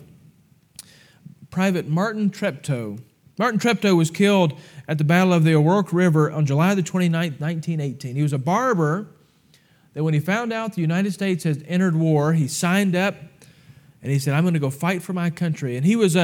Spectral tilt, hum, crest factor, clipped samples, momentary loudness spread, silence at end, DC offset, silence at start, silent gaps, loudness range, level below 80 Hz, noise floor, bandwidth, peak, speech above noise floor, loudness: -6.5 dB/octave; none; 16 dB; under 0.1%; 10 LU; 0 s; under 0.1%; 1.4 s; none; 5 LU; -70 dBFS; -57 dBFS; 16.5 kHz; -6 dBFS; 37 dB; -21 LUFS